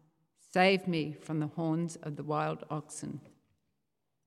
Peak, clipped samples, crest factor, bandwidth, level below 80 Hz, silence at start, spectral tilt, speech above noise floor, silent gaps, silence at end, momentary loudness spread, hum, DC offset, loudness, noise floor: -12 dBFS; under 0.1%; 22 dB; 12.5 kHz; -80 dBFS; 0.55 s; -5.5 dB/octave; 52 dB; none; 1 s; 15 LU; none; under 0.1%; -33 LUFS; -85 dBFS